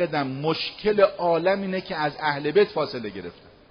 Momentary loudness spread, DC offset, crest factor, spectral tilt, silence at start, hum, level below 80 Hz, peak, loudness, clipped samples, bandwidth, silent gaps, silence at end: 12 LU; under 0.1%; 18 dB; -3.5 dB/octave; 0 s; none; -58 dBFS; -6 dBFS; -24 LUFS; under 0.1%; 6.4 kHz; none; 0.4 s